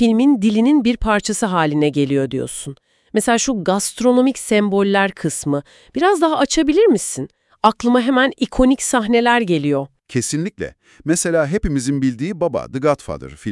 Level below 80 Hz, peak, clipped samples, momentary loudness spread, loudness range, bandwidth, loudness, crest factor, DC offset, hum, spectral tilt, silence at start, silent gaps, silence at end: -38 dBFS; 0 dBFS; under 0.1%; 10 LU; 4 LU; 12 kHz; -17 LUFS; 16 dB; under 0.1%; none; -4.5 dB/octave; 0 s; none; 0 s